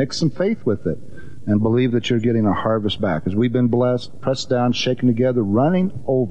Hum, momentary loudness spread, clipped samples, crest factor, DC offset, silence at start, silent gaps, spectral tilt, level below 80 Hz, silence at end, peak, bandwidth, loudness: none; 6 LU; under 0.1%; 12 dB; 2%; 0 s; none; -7 dB/octave; -52 dBFS; 0 s; -8 dBFS; 9 kHz; -19 LUFS